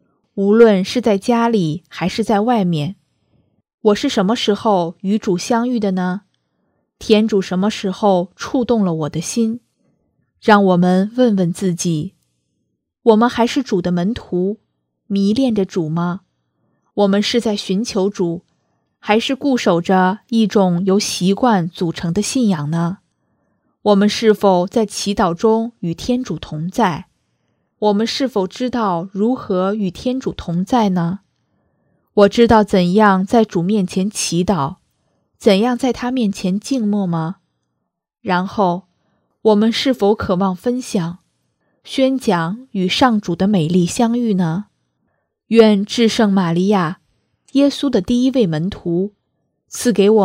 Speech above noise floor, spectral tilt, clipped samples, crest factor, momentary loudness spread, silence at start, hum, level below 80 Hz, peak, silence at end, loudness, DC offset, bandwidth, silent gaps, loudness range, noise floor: 59 dB; -6 dB/octave; under 0.1%; 16 dB; 9 LU; 0.35 s; none; -48 dBFS; 0 dBFS; 0 s; -16 LUFS; under 0.1%; 15 kHz; 3.74-3.78 s; 4 LU; -74 dBFS